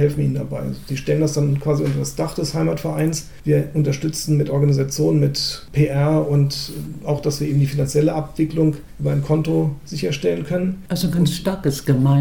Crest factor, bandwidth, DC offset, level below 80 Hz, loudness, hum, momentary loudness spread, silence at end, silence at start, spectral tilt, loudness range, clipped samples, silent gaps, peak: 14 dB; 18 kHz; 0.9%; -42 dBFS; -20 LUFS; none; 7 LU; 0 s; 0 s; -6.5 dB/octave; 2 LU; under 0.1%; none; -4 dBFS